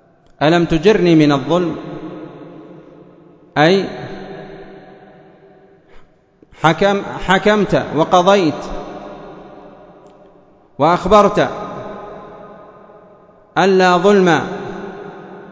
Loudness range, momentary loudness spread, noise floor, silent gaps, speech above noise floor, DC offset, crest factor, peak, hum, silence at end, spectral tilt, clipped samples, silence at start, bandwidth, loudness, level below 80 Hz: 6 LU; 23 LU; -49 dBFS; none; 36 dB; under 0.1%; 16 dB; 0 dBFS; none; 0.05 s; -6 dB/octave; under 0.1%; 0.4 s; 8 kHz; -14 LUFS; -44 dBFS